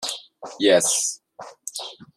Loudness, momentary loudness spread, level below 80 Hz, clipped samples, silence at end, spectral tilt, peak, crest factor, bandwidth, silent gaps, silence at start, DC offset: -21 LUFS; 21 LU; -70 dBFS; under 0.1%; 0.15 s; -1.5 dB/octave; -4 dBFS; 20 dB; 14.5 kHz; none; 0 s; under 0.1%